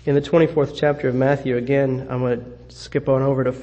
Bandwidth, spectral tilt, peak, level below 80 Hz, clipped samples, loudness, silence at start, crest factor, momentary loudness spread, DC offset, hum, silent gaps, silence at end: 8.6 kHz; -8 dB/octave; -4 dBFS; -48 dBFS; under 0.1%; -20 LUFS; 0.05 s; 16 dB; 9 LU; under 0.1%; none; none; 0 s